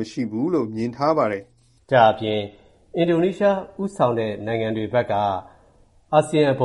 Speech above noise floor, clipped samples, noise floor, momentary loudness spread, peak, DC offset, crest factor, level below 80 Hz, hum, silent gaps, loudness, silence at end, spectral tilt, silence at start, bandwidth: 34 dB; under 0.1%; -55 dBFS; 10 LU; -2 dBFS; under 0.1%; 20 dB; -58 dBFS; none; none; -22 LUFS; 0 s; -6.5 dB/octave; 0 s; 11.5 kHz